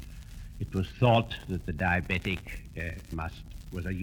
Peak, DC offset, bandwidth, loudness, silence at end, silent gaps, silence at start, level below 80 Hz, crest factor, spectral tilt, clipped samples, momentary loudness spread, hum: -10 dBFS; under 0.1%; 18 kHz; -31 LUFS; 0 s; none; 0 s; -44 dBFS; 22 dB; -7 dB/octave; under 0.1%; 19 LU; none